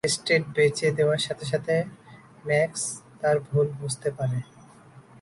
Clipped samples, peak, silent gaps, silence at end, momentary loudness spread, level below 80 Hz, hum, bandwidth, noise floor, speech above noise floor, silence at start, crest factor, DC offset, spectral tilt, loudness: under 0.1%; -10 dBFS; none; 0.2 s; 9 LU; -62 dBFS; none; 11.5 kHz; -51 dBFS; 26 dB; 0.05 s; 18 dB; under 0.1%; -4.5 dB/octave; -25 LUFS